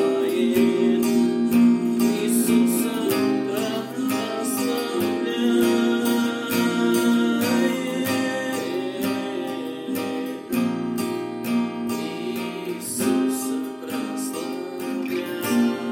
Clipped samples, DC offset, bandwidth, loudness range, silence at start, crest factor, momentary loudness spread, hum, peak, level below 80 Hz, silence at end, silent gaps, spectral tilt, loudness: under 0.1%; under 0.1%; 17 kHz; 6 LU; 0 s; 14 dB; 9 LU; none; -8 dBFS; -68 dBFS; 0 s; none; -4.5 dB/octave; -23 LUFS